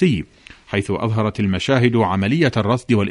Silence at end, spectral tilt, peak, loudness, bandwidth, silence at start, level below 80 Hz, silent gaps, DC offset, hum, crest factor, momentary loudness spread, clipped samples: 0 s; -7 dB/octave; -2 dBFS; -19 LUFS; 11 kHz; 0 s; -46 dBFS; none; under 0.1%; none; 16 dB; 8 LU; under 0.1%